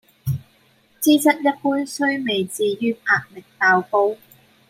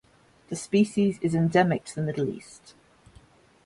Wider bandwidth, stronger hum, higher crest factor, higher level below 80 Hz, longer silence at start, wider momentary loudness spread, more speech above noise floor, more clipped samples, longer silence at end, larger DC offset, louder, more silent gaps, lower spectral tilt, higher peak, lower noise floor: first, 16 kHz vs 11.5 kHz; neither; about the same, 18 dB vs 18 dB; about the same, -60 dBFS vs -60 dBFS; second, 0.25 s vs 0.5 s; second, 12 LU vs 15 LU; first, 38 dB vs 31 dB; neither; second, 0.55 s vs 1.1 s; neither; first, -20 LUFS vs -25 LUFS; neither; second, -4.5 dB/octave vs -6.5 dB/octave; first, -4 dBFS vs -8 dBFS; about the same, -58 dBFS vs -56 dBFS